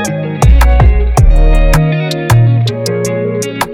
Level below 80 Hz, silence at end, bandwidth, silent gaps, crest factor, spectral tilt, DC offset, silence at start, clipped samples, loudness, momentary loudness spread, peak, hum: -10 dBFS; 0 s; 16.5 kHz; none; 8 dB; -6 dB/octave; under 0.1%; 0 s; under 0.1%; -11 LUFS; 7 LU; 0 dBFS; none